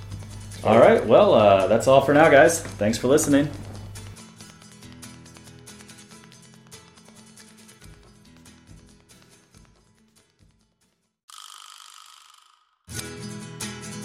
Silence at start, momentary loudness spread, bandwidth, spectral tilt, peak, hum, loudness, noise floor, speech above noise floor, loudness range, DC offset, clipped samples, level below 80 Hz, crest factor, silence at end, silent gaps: 0 s; 27 LU; 15.5 kHz; -5 dB/octave; -2 dBFS; none; -18 LUFS; -70 dBFS; 53 dB; 26 LU; under 0.1%; under 0.1%; -52 dBFS; 22 dB; 0 s; 11.23-11.28 s